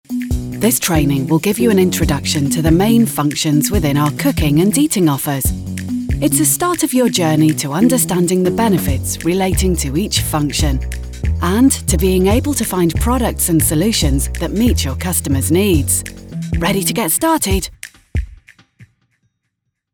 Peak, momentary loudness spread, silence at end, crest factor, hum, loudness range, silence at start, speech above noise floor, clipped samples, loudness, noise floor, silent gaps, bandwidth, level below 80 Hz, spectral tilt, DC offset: 0 dBFS; 8 LU; 1.1 s; 14 dB; none; 3 LU; 0.1 s; 58 dB; under 0.1%; -15 LUFS; -73 dBFS; none; over 20 kHz; -26 dBFS; -5 dB/octave; under 0.1%